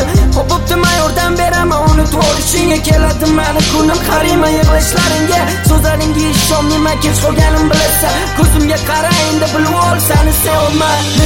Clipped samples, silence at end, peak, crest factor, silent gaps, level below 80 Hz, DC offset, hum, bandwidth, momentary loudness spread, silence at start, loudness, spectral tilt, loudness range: under 0.1%; 0 s; 0 dBFS; 10 dB; none; -18 dBFS; 2%; none; 17 kHz; 2 LU; 0 s; -11 LUFS; -4.5 dB/octave; 0 LU